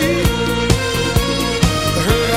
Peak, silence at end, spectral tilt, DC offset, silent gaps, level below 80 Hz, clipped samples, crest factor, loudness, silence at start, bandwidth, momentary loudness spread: 0 dBFS; 0 s; -4.5 dB/octave; 0.5%; none; -24 dBFS; under 0.1%; 16 dB; -16 LUFS; 0 s; 17 kHz; 1 LU